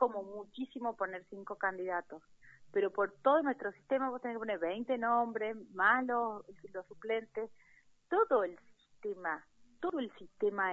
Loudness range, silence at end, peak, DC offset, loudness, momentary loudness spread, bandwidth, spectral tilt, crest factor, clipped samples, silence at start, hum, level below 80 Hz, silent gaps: 4 LU; 0 s; -14 dBFS; under 0.1%; -35 LUFS; 16 LU; 7.4 kHz; -2.5 dB/octave; 22 dB; under 0.1%; 0 s; none; -76 dBFS; none